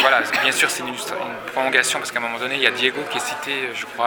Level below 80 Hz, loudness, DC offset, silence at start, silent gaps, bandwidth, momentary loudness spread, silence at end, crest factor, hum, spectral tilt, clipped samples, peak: -66 dBFS; -20 LUFS; under 0.1%; 0 s; none; over 20 kHz; 10 LU; 0 s; 22 dB; none; -1 dB/octave; under 0.1%; 0 dBFS